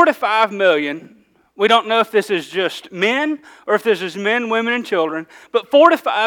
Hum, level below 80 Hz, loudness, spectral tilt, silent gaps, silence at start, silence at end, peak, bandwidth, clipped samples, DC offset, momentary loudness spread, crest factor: none; -68 dBFS; -17 LUFS; -4 dB/octave; none; 0 s; 0 s; 0 dBFS; 19.5 kHz; under 0.1%; under 0.1%; 10 LU; 16 dB